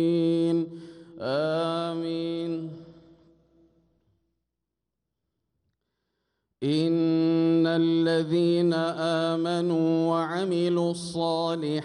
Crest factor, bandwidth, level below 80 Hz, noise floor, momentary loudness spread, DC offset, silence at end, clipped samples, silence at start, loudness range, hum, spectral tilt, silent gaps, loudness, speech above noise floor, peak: 14 dB; 10.5 kHz; -72 dBFS; -85 dBFS; 10 LU; under 0.1%; 0 s; under 0.1%; 0 s; 12 LU; none; -7 dB/octave; none; -26 LUFS; 60 dB; -14 dBFS